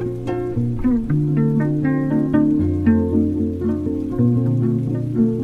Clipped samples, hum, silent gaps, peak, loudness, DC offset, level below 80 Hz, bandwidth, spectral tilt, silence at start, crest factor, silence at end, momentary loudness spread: under 0.1%; none; none; -6 dBFS; -19 LUFS; under 0.1%; -38 dBFS; 4.4 kHz; -11 dB/octave; 0 s; 12 dB; 0 s; 5 LU